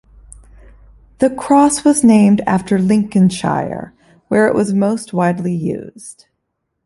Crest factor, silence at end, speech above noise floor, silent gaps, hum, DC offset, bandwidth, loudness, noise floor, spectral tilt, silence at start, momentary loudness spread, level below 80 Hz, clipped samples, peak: 14 dB; 0.75 s; 59 dB; none; none; under 0.1%; 11.5 kHz; -14 LUFS; -72 dBFS; -6 dB/octave; 1.2 s; 14 LU; -48 dBFS; under 0.1%; -2 dBFS